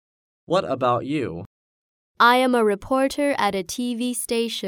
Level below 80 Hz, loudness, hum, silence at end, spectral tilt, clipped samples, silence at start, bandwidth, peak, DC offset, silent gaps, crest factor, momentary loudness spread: -56 dBFS; -22 LUFS; none; 0 s; -4 dB/octave; under 0.1%; 0.5 s; 19 kHz; -4 dBFS; under 0.1%; 1.46-2.14 s; 18 dB; 10 LU